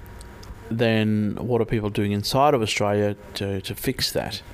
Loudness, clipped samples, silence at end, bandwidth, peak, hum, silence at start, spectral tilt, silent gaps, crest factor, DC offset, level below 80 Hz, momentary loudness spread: -23 LUFS; under 0.1%; 0 s; 16 kHz; -6 dBFS; none; 0 s; -5.5 dB/octave; none; 18 dB; under 0.1%; -46 dBFS; 12 LU